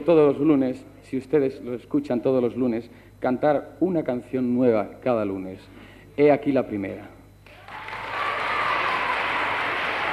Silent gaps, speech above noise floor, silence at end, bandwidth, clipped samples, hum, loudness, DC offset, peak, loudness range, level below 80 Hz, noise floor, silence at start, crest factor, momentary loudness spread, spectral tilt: none; 25 dB; 0 s; 13.5 kHz; under 0.1%; 50 Hz at -50 dBFS; -24 LUFS; under 0.1%; -6 dBFS; 2 LU; -56 dBFS; -48 dBFS; 0 s; 18 dB; 14 LU; -7 dB/octave